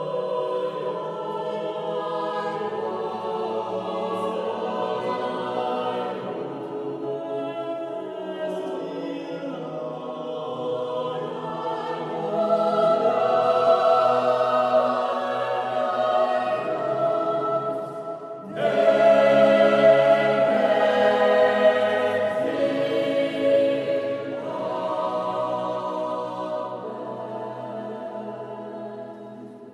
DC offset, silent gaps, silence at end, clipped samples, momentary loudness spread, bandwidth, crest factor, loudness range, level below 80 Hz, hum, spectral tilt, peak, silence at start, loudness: under 0.1%; none; 0 s; under 0.1%; 15 LU; 10.5 kHz; 18 dB; 12 LU; -78 dBFS; none; -6 dB/octave; -6 dBFS; 0 s; -24 LUFS